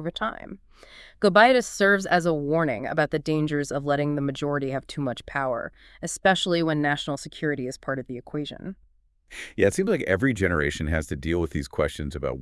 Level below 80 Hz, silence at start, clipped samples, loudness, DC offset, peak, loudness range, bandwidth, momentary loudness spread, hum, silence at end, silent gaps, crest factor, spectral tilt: -46 dBFS; 0 s; under 0.1%; -25 LUFS; under 0.1%; -4 dBFS; 6 LU; 12 kHz; 13 LU; none; 0 s; none; 20 dB; -5 dB/octave